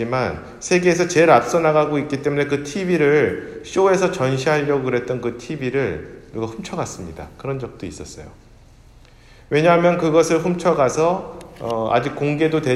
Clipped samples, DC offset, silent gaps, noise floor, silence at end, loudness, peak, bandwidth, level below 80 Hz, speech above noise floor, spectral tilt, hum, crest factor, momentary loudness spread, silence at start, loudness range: under 0.1%; under 0.1%; none; -47 dBFS; 0 s; -19 LUFS; 0 dBFS; 13 kHz; -48 dBFS; 28 dB; -5.5 dB/octave; none; 18 dB; 16 LU; 0 s; 10 LU